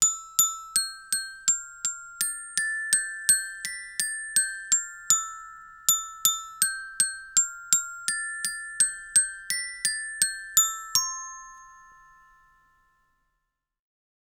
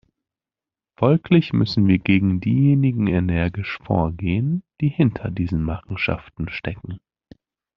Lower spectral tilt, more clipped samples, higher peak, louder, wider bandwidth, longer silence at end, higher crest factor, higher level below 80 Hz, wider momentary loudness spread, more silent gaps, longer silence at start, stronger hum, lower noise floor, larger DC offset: second, 4 dB/octave vs -7 dB/octave; neither; about the same, 0 dBFS vs -2 dBFS; second, -25 LUFS vs -21 LUFS; first, over 20 kHz vs 6 kHz; first, 2.35 s vs 0.8 s; first, 28 dB vs 18 dB; second, -64 dBFS vs -44 dBFS; second, 9 LU vs 12 LU; neither; second, 0 s vs 1 s; neither; second, -81 dBFS vs under -90 dBFS; neither